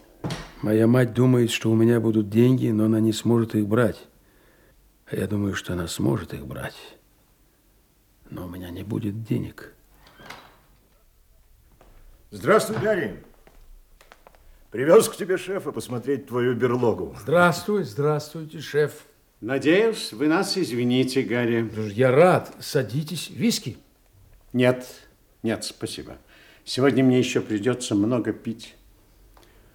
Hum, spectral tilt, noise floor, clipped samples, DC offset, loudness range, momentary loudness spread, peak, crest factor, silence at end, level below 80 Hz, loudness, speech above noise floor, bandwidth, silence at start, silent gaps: none; -6 dB/octave; -60 dBFS; under 0.1%; under 0.1%; 13 LU; 17 LU; -4 dBFS; 20 dB; 1.05 s; -56 dBFS; -23 LUFS; 38 dB; 18 kHz; 0.25 s; none